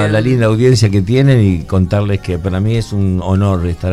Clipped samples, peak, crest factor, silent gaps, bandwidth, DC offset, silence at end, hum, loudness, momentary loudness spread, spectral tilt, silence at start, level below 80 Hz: under 0.1%; 0 dBFS; 12 dB; none; 12 kHz; under 0.1%; 0 s; none; -13 LUFS; 6 LU; -7 dB/octave; 0 s; -32 dBFS